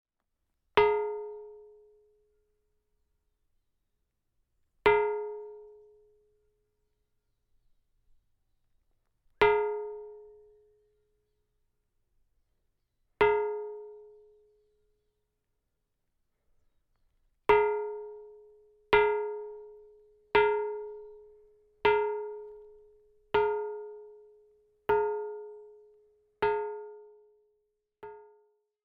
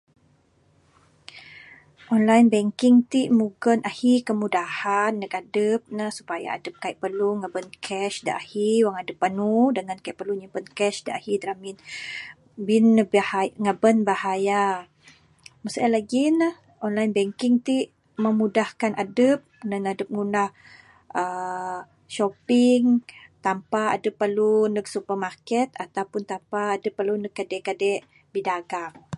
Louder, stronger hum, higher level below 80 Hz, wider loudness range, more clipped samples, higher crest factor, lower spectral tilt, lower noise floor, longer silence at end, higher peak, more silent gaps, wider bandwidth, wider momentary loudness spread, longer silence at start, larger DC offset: second, -29 LUFS vs -24 LUFS; neither; first, -62 dBFS vs -70 dBFS; about the same, 8 LU vs 6 LU; neither; first, 26 dB vs 20 dB; second, -1.5 dB/octave vs -5.5 dB/octave; first, -82 dBFS vs -62 dBFS; first, 0.65 s vs 0 s; second, -8 dBFS vs -4 dBFS; neither; second, 5.4 kHz vs 11.5 kHz; first, 24 LU vs 14 LU; second, 0.75 s vs 1.35 s; neither